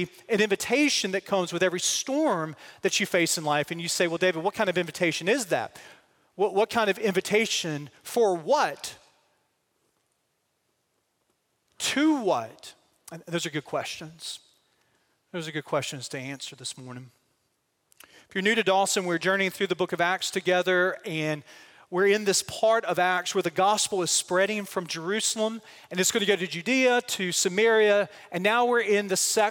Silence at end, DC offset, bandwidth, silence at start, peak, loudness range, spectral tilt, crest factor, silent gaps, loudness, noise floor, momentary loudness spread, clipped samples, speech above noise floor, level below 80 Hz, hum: 0 s; under 0.1%; 17 kHz; 0 s; -8 dBFS; 10 LU; -3 dB/octave; 18 dB; none; -25 LUFS; -75 dBFS; 13 LU; under 0.1%; 49 dB; -74 dBFS; none